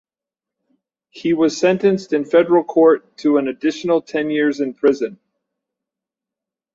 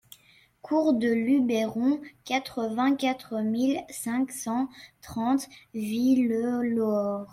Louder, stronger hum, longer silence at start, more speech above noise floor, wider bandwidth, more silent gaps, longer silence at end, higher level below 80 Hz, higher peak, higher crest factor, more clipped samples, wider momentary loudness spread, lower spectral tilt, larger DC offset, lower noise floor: first, -17 LUFS vs -27 LUFS; neither; first, 1.15 s vs 0.65 s; first, 71 dB vs 33 dB; second, 7.8 kHz vs 15.5 kHz; neither; first, 1.6 s vs 0.05 s; about the same, -66 dBFS vs -66 dBFS; first, -2 dBFS vs -12 dBFS; about the same, 16 dB vs 14 dB; neither; about the same, 7 LU vs 8 LU; about the same, -6 dB/octave vs -5 dB/octave; neither; first, -88 dBFS vs -60 dBFS